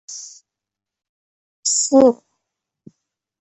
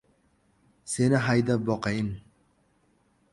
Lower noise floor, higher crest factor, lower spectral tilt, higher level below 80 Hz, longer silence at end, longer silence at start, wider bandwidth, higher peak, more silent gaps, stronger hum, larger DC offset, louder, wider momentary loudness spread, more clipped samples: first, -86 dBFS vs -67 dBFS; about the same, 20 dB vs 18 dB; second, -2.5 dB/octave vs -6 dB/octave; second, -62 dBFS vs -56 dBFS; first, 1.25 s vs 1.1 s; second, 0.1 s vs 0.85 s; second, 8.6 kHz vs 11.5 kHz; first, -2 dBFS vs -10 dBFS; first, 1.09-1.63 s vs none; neither; neither; first, -16 LUFS vs -26 LUFS; first, 20 LU vs 15 LU; neither